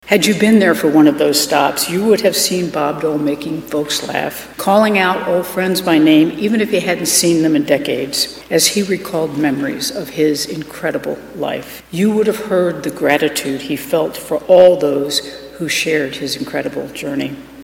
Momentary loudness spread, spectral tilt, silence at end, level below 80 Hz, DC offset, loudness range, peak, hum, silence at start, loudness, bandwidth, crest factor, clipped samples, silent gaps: 11 LU; -4 dB/octave; 0 s; -52 dBFS; under 0.1%; 4 LU; 0 dBFS; none; 0.05 s; -15 LUFS; 17 kHz; 14 dB; under 0.1%; none